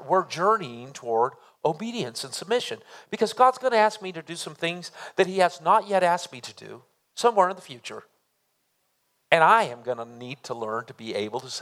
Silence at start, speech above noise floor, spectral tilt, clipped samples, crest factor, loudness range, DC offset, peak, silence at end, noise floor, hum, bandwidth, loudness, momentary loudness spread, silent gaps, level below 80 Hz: 0 s; 48 dB; -4 dB/octave; under 0.1%; 24 dB; 4 LU; under 0.1%; -2 dBFS; 0 s; -73 dBFS; none; 15.5 kHz; -24 LUFS; 18 LU; none; -82 dBFS